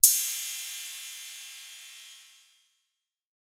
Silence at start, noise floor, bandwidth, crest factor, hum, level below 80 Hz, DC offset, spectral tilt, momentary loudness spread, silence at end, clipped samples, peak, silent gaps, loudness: 0.05 s; -83 dBFS; 19 kHz; 32 dB; none; under -90 dBFS; under 0.1%; 8.5 dB/octave; 20 LU; 1.25 s; under 0.1%; 0 dBFS; none; -29 LUFS